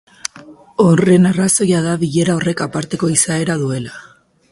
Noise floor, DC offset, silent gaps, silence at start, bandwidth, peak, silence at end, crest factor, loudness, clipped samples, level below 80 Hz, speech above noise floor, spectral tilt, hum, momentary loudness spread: -40 dBFS; under 0.1%; none; 0.25 s; 11.5 kHz; 0 dBFS; 0.5 s; 16 dB; -15 LUFS; under 0.1%; -52 dBFS; 26 dB; -5 dB/octave; none; 16 LU